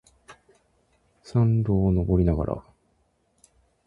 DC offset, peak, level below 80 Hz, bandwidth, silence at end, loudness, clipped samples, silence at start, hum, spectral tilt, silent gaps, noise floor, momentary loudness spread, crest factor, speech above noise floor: under 0.1%; -8 dBFS; -38 dBFS; 10.5 kHz; 1.25 s; -24 LUFS; under 0.1%; 0.3 s; none; -10.5 dB/octave; none; -68 dBFS; 8 LU; 18 dB; 46 dB